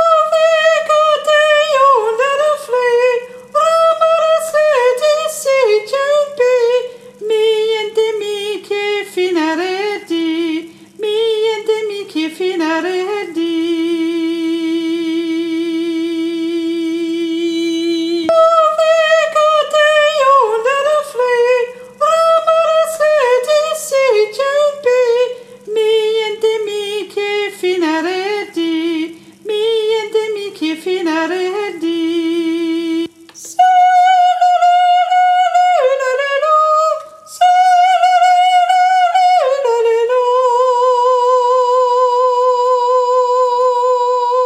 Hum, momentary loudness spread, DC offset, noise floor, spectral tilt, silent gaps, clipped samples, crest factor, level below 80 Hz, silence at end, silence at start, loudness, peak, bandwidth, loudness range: none; 9 LU; under 0.1%; -35 dBFS; -2 dB/octave; none; under 0.1%; 12 dB; -68 dBFS; 0 s; 0 s; -13 LUFS; 0 dBFS; 15.5 kHz; 6 LU